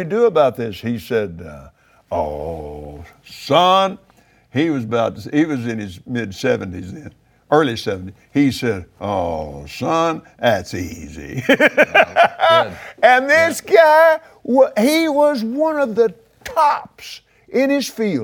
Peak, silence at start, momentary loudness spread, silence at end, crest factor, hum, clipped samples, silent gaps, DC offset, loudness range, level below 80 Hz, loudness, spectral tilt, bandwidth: 0 dBFS; 0 s; 17 LU; 0 s; 18 dB; none; under 0.1%; none; under 0.1%; 8 LU; -48 dBFS; -17 LUFS; -5 dB/octave; 19.5 kHz